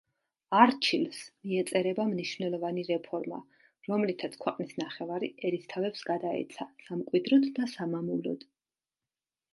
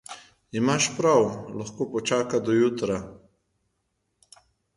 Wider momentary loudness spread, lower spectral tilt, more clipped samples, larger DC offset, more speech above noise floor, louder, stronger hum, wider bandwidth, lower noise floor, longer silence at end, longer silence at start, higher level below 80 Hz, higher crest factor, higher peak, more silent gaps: about the same, 13 LU vs 15 LU; about the same, -5.5 dB/octave vs -4.5 dB/octave; neither; neither; first, over 60 dB vs 52 dB; second, -31 LUFS vs -24 LUFS; neither; about the same, 11.5 kHz vs 11.5 kHz; first, under -90 dBFS vs -76 dBFS; second, 1.15 s vs 1.6 s; first, 0.5 s vs 0.1 s; second, -82 dBFS vs -60 dBFS; first, 26 dB vs 18 dB; about the same, -6 dBFS vs -8 dBFS; neither